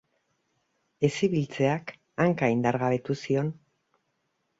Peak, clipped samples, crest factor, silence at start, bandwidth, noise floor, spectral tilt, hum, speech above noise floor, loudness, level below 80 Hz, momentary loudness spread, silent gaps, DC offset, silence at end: -8 dBFS; under 0.1%; 20 dB; 1 s; 8 kHz; -76 dBFS; -7 dB/octave; none; 50 dB; -27 LUFS; -64 dBFS; 6 LU; none; under 0.1%; 1.05 s